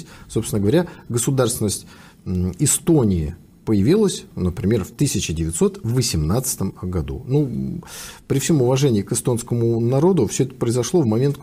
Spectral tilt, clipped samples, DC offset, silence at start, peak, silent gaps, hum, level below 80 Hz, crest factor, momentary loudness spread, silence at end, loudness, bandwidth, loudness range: -5.5 dB/octave; under 0.1%; under 0.1%; 0 s; -6 dBFS; none; none; -40 dBFS; 14 dB; 10 LU; 0 s; -20 LUFS; 15.5 kHz; 2 LU